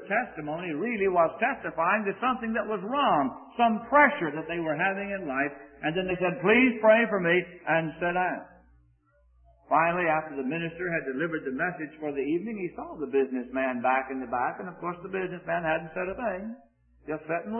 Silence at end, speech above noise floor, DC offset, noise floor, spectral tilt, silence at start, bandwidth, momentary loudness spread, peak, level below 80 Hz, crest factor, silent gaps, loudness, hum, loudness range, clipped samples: 0 s; 36 dB; under 0.1%; -64 dBFS; -10 dB/octave; 0 s; 3.3 kHz; 13 LU; -6 dBFS; -62 dBFS; 22 dB; none; -27 LUFS; none; 6 LU; under 0.1%